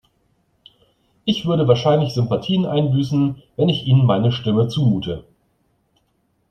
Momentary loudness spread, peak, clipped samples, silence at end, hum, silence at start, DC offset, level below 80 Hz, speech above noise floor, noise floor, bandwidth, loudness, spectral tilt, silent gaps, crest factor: 7 LU; -2 dBFS; under 0.1%; 1.3 s; none; 1.25 s; under 0.1%; -52 dBFS; 48 dB; -66 dBFS; 8.6 kHz; -18 LUFS; -8 dB/octave; none; 18 dB